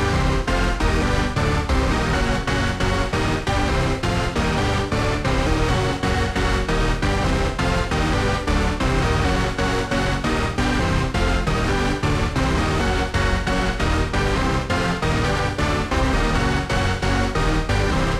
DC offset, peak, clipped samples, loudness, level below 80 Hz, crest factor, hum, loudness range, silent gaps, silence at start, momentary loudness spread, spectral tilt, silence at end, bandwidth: under 0.1%; -6 dBFS; under 0.1%; -21 LUFS; -26 dBFS; 14 dB; none; 0 LU; none; 0 s; 2 LU; -5.5 dB/octave; 0 s; 13.5 kHz